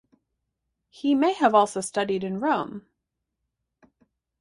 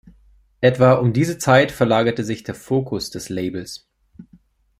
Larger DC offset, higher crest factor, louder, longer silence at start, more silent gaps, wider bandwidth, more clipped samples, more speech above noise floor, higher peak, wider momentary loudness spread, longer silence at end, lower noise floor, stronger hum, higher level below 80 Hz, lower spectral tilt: neither; about the same, 20 dB vs 18 dB; second, -24 LUFS vs -19 LUFS; first, 1.05 s vs 0.6 s; neither; second, 11.5 kHz vs 15.5 kHz; neither; first, 59 dB vs 36 dB; second, -6 dBFS vs -2 dBFS; second, 10 LU vs 13 LU; first, 1.6 s vs 0.55 s; first, -82 dBFS vs -54 dBFS; neither; second, -70 dBFS vs -52 dBFS; second, -4.5 dB/octave vs -6 dB/octave